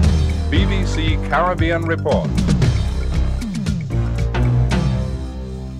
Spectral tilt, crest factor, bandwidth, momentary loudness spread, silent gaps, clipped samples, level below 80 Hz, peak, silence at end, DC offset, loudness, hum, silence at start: -6.5 dB/octave; 14 dB; 11.5 kHz; 6 LU; none; under 0.1%; -22 dBFS; -4 dBFS; 0 s; under 0.1%; -19 LUFS; none; 0 s